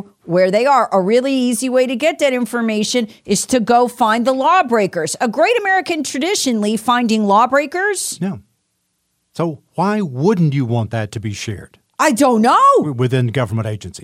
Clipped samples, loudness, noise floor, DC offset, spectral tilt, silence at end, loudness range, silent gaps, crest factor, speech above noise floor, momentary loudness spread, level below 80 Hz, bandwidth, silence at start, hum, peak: under 0.1%; -16 LUFS; -68 dBFS; under 0.1%; -5 dB/octave; 0 s; 5 LU; none; 14 dB; 53 dB; 10 LU; -56 dBFS; 16 kHz; 0.25 s; none; -2 dBFS